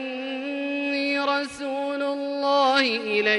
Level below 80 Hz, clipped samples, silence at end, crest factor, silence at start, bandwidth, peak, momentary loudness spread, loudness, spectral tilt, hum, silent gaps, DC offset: -70 dBFS; under 0.1%; 0 s; 18 dB; 0 s; 11.5 kHz; -6 dBFS; 10 LU; -24 LUFS; -3 dB/octave; none; none; under 0.1%